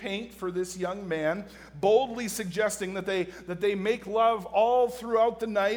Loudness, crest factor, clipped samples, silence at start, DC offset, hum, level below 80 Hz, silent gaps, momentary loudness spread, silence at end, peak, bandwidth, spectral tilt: -28 LUFS; 16 dB; under 0.1%; 0 s; under 0.1%; none; -60 dBFS; none; 10 LU; 0 s; -10 dBFS; over 20 kHz; -4.5 dB/octave